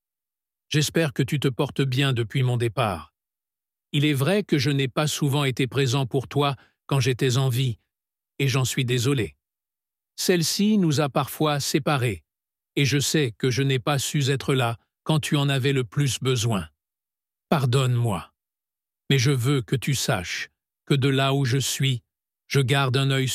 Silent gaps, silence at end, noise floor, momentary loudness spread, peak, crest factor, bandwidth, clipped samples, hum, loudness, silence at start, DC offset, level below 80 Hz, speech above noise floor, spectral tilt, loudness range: none; 0 s; under -90 dBFS; 6 LU; -6 dBFS; 18 dB; 16 kHz; under 0.1%; none; -23 LUFS; 0.7 s; under 0.1%; -58 dBFS; over 67 dB; -5 dB/octave; 2 LU